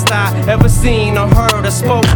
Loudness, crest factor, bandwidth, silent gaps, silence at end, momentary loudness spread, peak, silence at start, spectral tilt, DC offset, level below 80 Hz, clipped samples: -12 LUFS; 10 dB; 19.5 kHz; none; 0 s; 3 LU; 0 dBFS; 0 s; -5 dB/octave; under 0.1%; -18 dBFS; under 0.1%